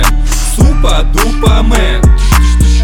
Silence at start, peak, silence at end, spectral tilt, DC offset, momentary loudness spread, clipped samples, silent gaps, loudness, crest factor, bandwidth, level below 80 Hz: 0 s; 0 dBFS; 0 s; -5 dB/octave; under 0.1%; 4 LU; under 0.1%; none; -10 LUFS; 6 dB; 18 kHz; -8 dBFS